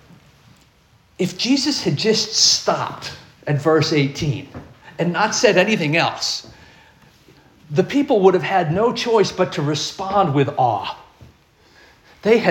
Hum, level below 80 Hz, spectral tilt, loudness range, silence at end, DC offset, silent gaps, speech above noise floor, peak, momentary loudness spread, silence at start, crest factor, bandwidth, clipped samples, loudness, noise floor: none; -54 dBFS; -4 dB/octave; 2 LU; 0 s; under 0.1%; none; 37 dB; 0 dBFS; 13 LU; 1.2 s; 18 dB; 17 kHz; under 0.1%; -18 LUFS; -55 dBFS